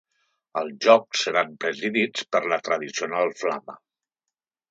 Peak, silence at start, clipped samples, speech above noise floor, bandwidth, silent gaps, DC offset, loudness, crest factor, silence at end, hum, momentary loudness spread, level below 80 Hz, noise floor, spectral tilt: -2 dBFS; 0.55 s; under 0.1%; 63 dB; 8 kHz; none; under 0.1%; -24 LUFS; 22 dB; 0.95 s; none; 13 LU; -78 dBFS; -87 dBFS; -3 dB/octave